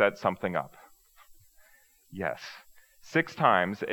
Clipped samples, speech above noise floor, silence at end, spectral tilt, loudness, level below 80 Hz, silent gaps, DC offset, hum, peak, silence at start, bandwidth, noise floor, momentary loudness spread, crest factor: under 0.1%; 33 dB; 0 s; -6 dB/octave; -28 LUFS; -70 dBFS; none; under 0.1%; none; -8 dBFS; 0 s; over 20 kHz; -62 dBFS; 21 LU; 24 dB